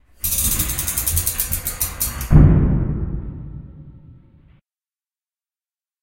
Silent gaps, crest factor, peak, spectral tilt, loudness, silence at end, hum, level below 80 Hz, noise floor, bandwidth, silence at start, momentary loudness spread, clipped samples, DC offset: none; 20 dB; 0 dBFS; -4.5 dB/octave; -18 LUFS; 1.9 s; none; -26 dBFS; under -90 dBFS; 17.5 kHz; 0.25 s; 18 LU; under 0.1%; under 0.1%